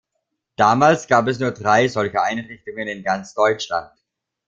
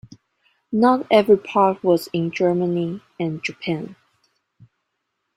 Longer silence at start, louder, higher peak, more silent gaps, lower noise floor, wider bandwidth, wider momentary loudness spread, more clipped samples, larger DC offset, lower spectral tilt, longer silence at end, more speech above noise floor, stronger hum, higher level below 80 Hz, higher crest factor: about the same, 0.6 s vs 0.7 s; about the same, -19 LUFS vs -20 LUFS; about the same, -2 dBFS vs -2 dBFS; neither; about the same, -76 dBFS vs -76 dBFS; second, 7.8 kHz vs 15.5 kHz; about the same, 14 LU vs 12 LU; neither; neither; second, -5 dB/octave vs -7 dB/octave; second, 0.6 s vs 1.45 s; about the same, 58 dB vs 57 dB; neither; first, -58 dBFS vs -64 dBFS; about the same, 18 dB vs 20 dB